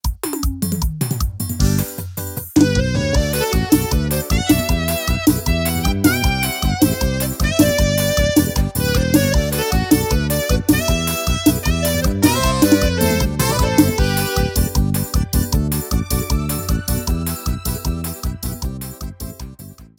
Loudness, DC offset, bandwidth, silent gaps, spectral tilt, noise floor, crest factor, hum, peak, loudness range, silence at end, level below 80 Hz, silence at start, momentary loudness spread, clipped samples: -18 LUFS; under 0.1%; 18.5 kHz; none; -5 dB/octave; -38 dBFS; 16 dB; none; 0 dBFS; 5 LU; 0.15 s; -24 dBFS; 0.05 s; 9 LU; under 0.1%